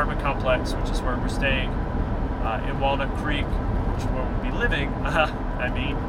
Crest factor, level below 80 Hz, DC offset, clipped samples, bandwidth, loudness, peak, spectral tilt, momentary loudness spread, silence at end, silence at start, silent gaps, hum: 16 dB; -28 dBFS; under 0.1%; under 0.1%; 11 kHz; -26 LUFS; -8 dBFS; -6.5 dB/octave; 4 LU; 0 s; 0 s; none; none